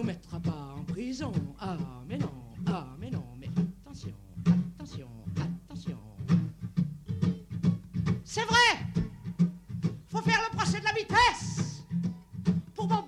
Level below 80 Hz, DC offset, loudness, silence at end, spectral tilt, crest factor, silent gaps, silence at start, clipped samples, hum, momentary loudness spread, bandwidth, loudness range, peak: -54 dBFS; under 0.1%; -31 LUFS; 0 s; -5 dB/octave; 20 dB; none; 0 s; under 0.1%; none; 15 LU; 11.5 kHz; 8 LU; -12 dBFS